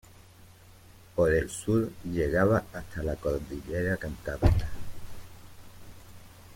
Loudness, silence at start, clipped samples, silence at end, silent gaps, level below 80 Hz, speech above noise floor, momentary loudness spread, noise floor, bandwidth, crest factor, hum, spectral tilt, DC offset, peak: -29 LUFS; 0.4 s; under 0.1%; 0 s; none; -40 dBFS; 26 dB; 19 LU; -53 dBFS; 16.5 kHz; 22 dB; none; -7 dB/octave; under 0.1%; -8 dBFS